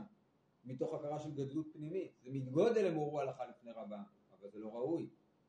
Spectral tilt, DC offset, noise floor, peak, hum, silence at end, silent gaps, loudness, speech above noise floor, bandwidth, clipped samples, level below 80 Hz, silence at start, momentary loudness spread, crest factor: -7.5 dB/octave; under 0.1%; -75 dBFS; -22 dBFS; none; 0.4 s; none; -40 LUFS; 35 dB; 9.6 kHz; under 0.1%; -84 dBFS; 0 s; 19 LU; 20 dB